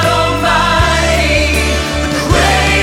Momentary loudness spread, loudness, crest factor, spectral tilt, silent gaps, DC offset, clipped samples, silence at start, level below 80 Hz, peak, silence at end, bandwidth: 5 LU; -11 LUFS; 12 dB; -4 dB/octave; none; under 0.1%; under 0.1%; 0 s; -20 dBFS; 0 dBFS; 0 s; 16.5 kHz